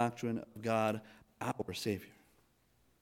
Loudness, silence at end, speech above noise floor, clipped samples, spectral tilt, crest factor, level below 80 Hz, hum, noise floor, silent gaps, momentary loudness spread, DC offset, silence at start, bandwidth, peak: -38 LUFS; 0.9 s; 36 dB; under 0.1%; -5.5 dB/octave; 20 dB; -72 dBFS; none; -72 dBFS; none; 9 LU; under 0.1%; 0 s; 17 kHz; -20 dBFS